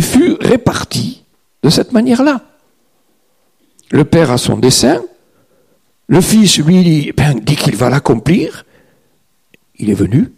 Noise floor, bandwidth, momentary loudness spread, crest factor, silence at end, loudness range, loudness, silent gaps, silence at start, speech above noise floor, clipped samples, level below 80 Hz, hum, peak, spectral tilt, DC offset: -59 dBFS; 15.5 kHz; 10 LU; 12 dB; 0.1 s; 4 LU; -11 LUFS; none; 0 s; 49 dB; under 0.1%; -38 dBFS; none; 0 dBFS; -5 dB/octave; 0.1%